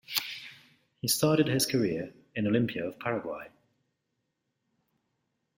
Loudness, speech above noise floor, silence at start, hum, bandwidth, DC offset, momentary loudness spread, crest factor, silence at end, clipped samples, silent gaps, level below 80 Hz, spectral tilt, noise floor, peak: -29 LUFS; 53 dB; 0.1 s; none; 16.5 kHz; under 0.1%; 17 LU; 24 dB; 2.1 s; under 0.1%; none; -68 dBFS; -4.5 dB/octave; -81 dBFS; -8 dBFS